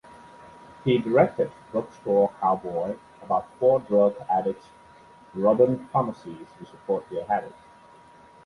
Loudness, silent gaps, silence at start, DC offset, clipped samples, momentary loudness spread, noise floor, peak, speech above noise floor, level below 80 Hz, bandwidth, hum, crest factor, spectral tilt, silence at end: -25 LUFS; none; 0.4 s; under 0.1%; under 0.1%; 19 LU; -51 dBFS; -4 dBFS; 27 dB; -62 dBFS; 10.5 kHz; none; 20 dB; -8.5 dB/octave; 0.95 s